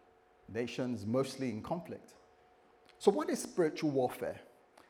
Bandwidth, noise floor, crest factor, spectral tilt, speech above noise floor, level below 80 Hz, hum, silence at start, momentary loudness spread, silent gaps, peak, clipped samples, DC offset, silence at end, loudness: 17 kHz; -65 dBFS; 24 dB; -5.5 dB/octave; 30 dB; -74 dBFS; none; 0.5 s; 12 LU; none; -12 dBFS; under 0.1%; under 0.1%; 0.45 s; -35 LUFS